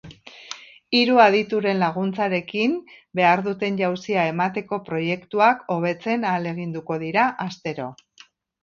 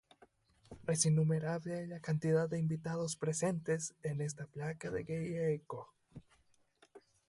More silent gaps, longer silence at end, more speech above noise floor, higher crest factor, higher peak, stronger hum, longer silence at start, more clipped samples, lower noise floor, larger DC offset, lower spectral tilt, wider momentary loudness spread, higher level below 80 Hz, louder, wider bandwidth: neither; first, 0.7 s vs 0.3 s; about the same, 32 dB vs 35 dB; about the same, 20 dB vs 22 dB; first, -2 dBFS vs -16 dBFS; neither; second, 0.05 s vs 0.7 s; neither; second, -53 dBFS vs -72 dBFS; neither; about the same, -6 dB/octave vs -5.5 dB/octave; first, 14 LU vs 11 LU; about the same, -66 dBFS vs -70 dBFS; first, -22 LUFS vs -37 LUFS; second, 7.2 kHz vs 11.5 kHz